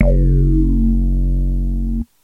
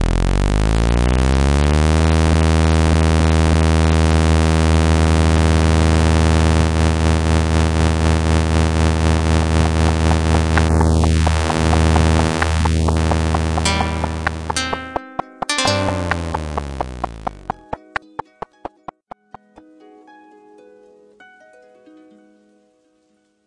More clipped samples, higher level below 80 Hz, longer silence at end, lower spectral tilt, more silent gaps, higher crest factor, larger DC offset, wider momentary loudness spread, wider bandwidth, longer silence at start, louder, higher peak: neither; first, -16 dBFS vs -24 dBFS; second, 0.2 s vs 5.7 s; first, -11.5 dB/octave vs -6 dB/octave; neither; about the same, 14 dB vs 14 dB; neither; second, 7 LU vs 12 LU; second, 2.3 kHz vs 11.5 kHz; about the same, 0 s vs 0 s; about the same, -18 LUFS vs -16 LUFS; about the same, 0 dBFS vs -2 dBFS